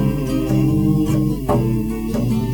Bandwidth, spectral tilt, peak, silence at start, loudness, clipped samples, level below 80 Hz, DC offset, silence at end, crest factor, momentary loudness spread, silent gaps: 19.5 kHz; -8 dB/octave; -4 dBFS; 0 s; -19 LUFS; under 0.1%; -30 dBFS; 0.4%; 0 s; 14 dB; 5 LU; none